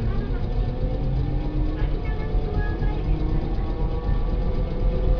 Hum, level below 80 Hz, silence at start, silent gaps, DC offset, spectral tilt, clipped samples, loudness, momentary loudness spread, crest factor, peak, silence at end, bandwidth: none; -24 dBFS; 0 s; none; under 0.1%; -9.5 dB/octave; under 0.1%; -27 LUFS; 2 LU; 14 dB; -8 dBFS; 0 s; 5.4 kHz